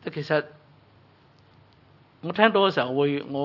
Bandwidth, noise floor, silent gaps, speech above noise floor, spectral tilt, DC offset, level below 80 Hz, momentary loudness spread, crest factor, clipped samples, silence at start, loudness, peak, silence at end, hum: 6 kHz; -57 dBFS; none; 33 dB; -7 dB/octave; under 0.1%; -74 dBFS; 16 LU; 24 dB; under 0.1%; 0.05 s; -23 LUFS; -2 dBFS; 0 s; none